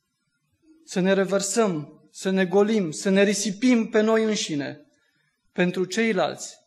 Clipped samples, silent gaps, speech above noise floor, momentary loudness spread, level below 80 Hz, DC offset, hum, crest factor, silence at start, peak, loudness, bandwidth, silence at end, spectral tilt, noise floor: under 0.1%; none; 52 dB; 11 LU; -74 dBFS; under 0.1%; none; 16 dB; 0.9 s; -8 dBFS; -23 LUFS; 12.5 kHz; 0.15 s; -4.5 dB/octave; -74 dBFS